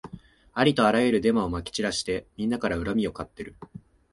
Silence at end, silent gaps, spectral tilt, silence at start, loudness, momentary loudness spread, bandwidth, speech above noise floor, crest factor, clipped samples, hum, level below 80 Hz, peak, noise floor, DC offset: 0.35 s; none; -5 dB/octave; 0.05 s; -25 LUFS; 20 LU; 11.5 kHz; 22 dB; 20 dB; under 0.1%; none; -48 dBFS; -6 dBFS; -47 dBFS; under 0.1%